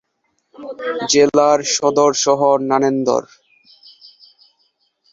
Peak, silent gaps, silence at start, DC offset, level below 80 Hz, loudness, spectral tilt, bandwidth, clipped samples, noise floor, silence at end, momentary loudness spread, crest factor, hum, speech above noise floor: 0 dBFS; none; 0.6 s; under 0.1%; -62 dBFS; -15 LUFS; -3 dB/octave; 7.8 kHz; under 0.1%; -68 dBFS; 1.9 s; 12 LU; 18 dB; none; 53 dB